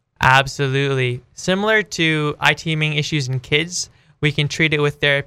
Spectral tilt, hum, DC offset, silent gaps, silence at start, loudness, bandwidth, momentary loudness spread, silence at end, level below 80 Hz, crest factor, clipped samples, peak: -4.5 dB/octave; none; under 0.1%; none; 0.2 s; -18 LUFS; 14.5 kHz; 8 LU; 0 s; -46 dBFS; 18 dB; under 0.1%; 0 dBFS